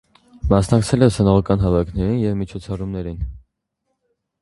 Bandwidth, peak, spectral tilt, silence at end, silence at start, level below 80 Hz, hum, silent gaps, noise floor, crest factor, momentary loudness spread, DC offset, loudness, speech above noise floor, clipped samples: 11.5 kHz; 0 dBFS; -7.5 dB/octave; 1.05 s; 0.45 s; -32 dBFS; none; none; -75 dBFS; 20 dB; 13 LU; under 0.1%; -19 LUFS; 57 dB; under 0.1%